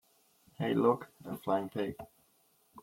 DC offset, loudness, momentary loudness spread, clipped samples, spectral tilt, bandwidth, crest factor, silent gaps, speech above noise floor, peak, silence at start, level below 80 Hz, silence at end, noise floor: under 0.1%; -34 LUFS; 17 LU; under 0.1%; -7.5 dB/octave; 16.5 kHz; 20 dB; none; 37 dB; -14 dBFS; 0.6 s; -72 dBFS; 0 s; -70 dBFS